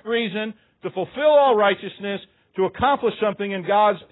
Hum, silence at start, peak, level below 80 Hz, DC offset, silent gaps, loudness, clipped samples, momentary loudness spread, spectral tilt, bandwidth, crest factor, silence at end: none; 0.05 s; -6 dBFS; -56 dBFS; under 0.1%; none; -21 LUFS; under 0.1%; 16 LU; -10 dB/octave; 4.1 kHz; 16 dB; 0.1 s